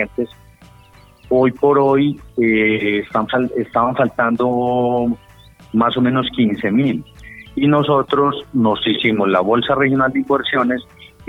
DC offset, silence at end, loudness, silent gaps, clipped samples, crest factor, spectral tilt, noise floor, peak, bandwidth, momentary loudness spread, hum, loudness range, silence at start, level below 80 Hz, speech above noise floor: under 0.1%; 0 s; -17 LUFS; none; under 0.1%; 14 dB; -8 dB/octave; -46 dBFS; -2 dBFS; 5.6 kHz; 8 LU; none; 2 LU; 0 s; -48 dBFS; 30 dB